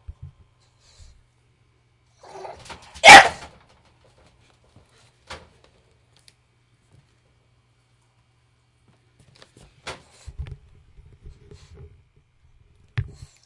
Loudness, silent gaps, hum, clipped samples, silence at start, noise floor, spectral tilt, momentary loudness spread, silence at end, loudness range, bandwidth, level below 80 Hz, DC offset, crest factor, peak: -8 LUFS; none; none; 0.2%; 3.05 s; -63 dBFS; -1.5 dB/octave; 34 LU; 0.45 s; 25 LU; 12 kHz; -50 dBFS; under 0.1%; 24 dB; 0 dBFS